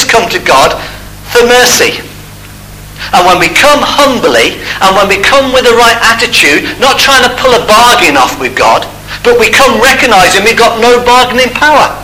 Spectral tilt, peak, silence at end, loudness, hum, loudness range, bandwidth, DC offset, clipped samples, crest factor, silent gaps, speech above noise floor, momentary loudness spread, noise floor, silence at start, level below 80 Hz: -2 dB/octave; 0 dBFS; 0 s; -5 LUFS; 50 Hz at -35 dBFS; 3 LU; over 20 kHz; under 0.1%; 5%; 6 dB; none; 22 dB; 7 LU; -27 dBFS; 0 s; -30 dBFS